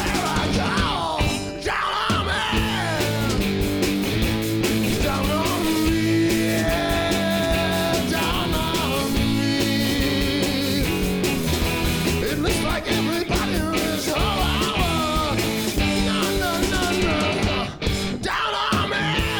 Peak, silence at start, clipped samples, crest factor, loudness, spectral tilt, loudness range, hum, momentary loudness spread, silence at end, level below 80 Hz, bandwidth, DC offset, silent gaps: -8 dBFS; 0 s; under 0.1%; 12 dB; -22 LUFS; -4.5 dB/octave; 1 LU; none; 2 LU; 0 s; -32 dBFS; over 20 kHz; under 0.1%; none